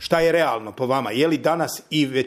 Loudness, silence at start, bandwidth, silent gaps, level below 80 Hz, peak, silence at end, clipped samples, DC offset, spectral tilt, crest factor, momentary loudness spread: -21 LUFS; 0 s; 15.5 kHz; none; -56 dBFS; -4 dBFS; 0 s; under 0.1%; under 0.1%; -5 dB/octave; 18 dB; 5 LU